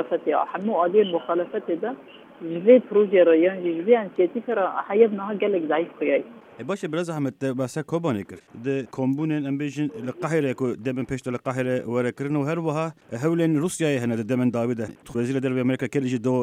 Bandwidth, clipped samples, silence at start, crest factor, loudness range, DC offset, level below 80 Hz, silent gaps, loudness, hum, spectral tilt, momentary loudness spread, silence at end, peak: 15 kHz; under 0.1%; 0 s; 20 dB; 7 LU; under 0.1%; -64 dBFS; none; -24 LUFS; none; -7 dB/octave; 10 LU; 0 s; -4 dBFS